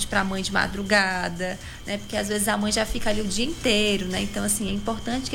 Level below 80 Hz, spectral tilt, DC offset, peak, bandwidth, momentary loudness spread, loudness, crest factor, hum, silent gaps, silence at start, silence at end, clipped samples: -38 dBFS; -3 dB/octave; under 0.1%; -6 dBFS; 17 kHz; 8 LU; -24 LUFS; 18 dB; none; none; 0 s; 0 s; under 0.1%